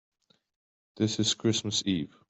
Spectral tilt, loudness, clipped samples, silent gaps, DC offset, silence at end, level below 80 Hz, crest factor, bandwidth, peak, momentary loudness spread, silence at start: -4 dB/octave; -28 LUFS; under 0.1%; none; under 0.1%; 0.25 s; -68 dBFS; 18 dB; 8.4 kHz; -12 dBFS; 5 LU; 0.95 s